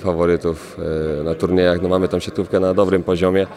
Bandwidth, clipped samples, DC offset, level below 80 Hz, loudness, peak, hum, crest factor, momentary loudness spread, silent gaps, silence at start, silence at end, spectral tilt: 13.5 kHz; under 0.1%; under 0.1%; -44 dBFS; -18 LUFS; -2 dBFS; none; 16 dB; 7 LU; none; 0 s; 0 s; -7 dB/octave